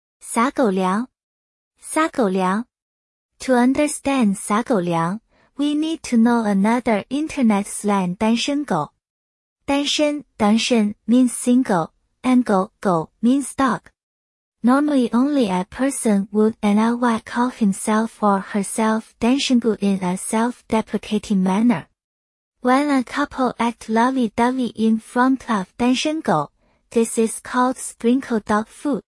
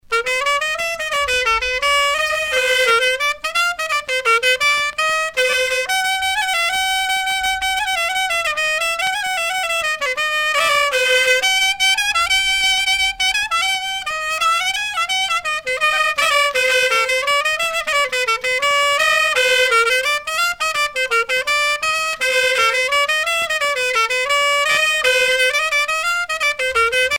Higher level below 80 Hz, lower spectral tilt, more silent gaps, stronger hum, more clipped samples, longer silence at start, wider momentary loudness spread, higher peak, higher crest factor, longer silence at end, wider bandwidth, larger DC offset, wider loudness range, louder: second, -56 dBFS vs -48 dBFS; first, -5 dB/octave vs 1.5 dB/octave; first, 1.23-1.71 s, 2.82-3.29 s, 9.10-9.56 s, 14.03-14.52 s, 22.04-22.52 s vs none; neither; neither; first, 0.25 s vs 0.1 s; about the same, 7 LU vs 5 LU; about the same, -4 dBFS vs -2 dBFS; about the same, 16 dB vs 14 dB; first, 0.15 s vs 0 s; second, 12 kHz vs over 20 kHz; neither; about the same, 2 LU vs 3 LU; second, -20 LUFS vs -16 LUFS